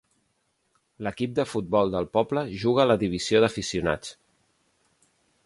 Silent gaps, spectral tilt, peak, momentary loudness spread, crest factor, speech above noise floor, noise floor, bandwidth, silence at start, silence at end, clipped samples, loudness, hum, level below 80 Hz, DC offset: none; -5.5 dB/octave; -8 dBFS; 10 LU; 20 dB; 48 dB; -72 dBFS; 11.5 kHz; 1 s; 1.35 s; under 0.1%; -25 LUFS; none; -54 dBFS; under 0.1%